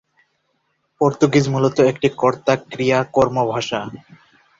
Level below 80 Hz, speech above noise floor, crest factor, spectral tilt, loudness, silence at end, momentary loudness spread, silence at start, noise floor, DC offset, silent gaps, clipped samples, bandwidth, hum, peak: -54 dBFS; 51 dB; 18 dB; -6 dB/octave; -18 LUFS; 0.6 s; 7 LU; 1 s; -68 dBFS; under 0.1%; none; under 0.1%; 7.8 kHz; none; -2 dBFS